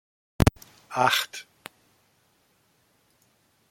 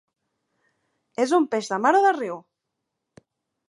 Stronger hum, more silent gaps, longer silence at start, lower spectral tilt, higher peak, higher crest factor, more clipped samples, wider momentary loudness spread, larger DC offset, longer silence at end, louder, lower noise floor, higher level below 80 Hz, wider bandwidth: neither; neither; second, 0.4 s vs 1.2 s; about the same, -4.5 dB/octave vs -4 dB/octave; first, -2 dBFS vs -6 dBFS; first, 28 dB vs 20 dB; neither; first, 24 LU vs 17 LU; neither; first, 2.3 s vs 1.3 s; second, -25 LUFS vs -22 LUFS; second, -67 dBFS vs -81 dBFS; first, -42 dBFS vs -82 dBFS; first, 16.5 kHz vs 11.5 kHz